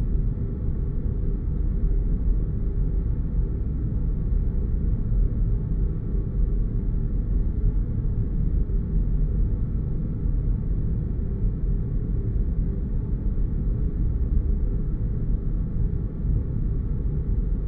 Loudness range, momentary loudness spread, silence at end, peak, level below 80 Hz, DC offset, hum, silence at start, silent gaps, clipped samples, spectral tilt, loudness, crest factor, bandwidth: 1 LU; 2 LU; 0 s; -12 dBFS; -24 dBFS; under 0.1%; none; 0 s; none; under 0.1%; -13.5 dB/octave; -27 LUFS; 12 dB; 2 kHz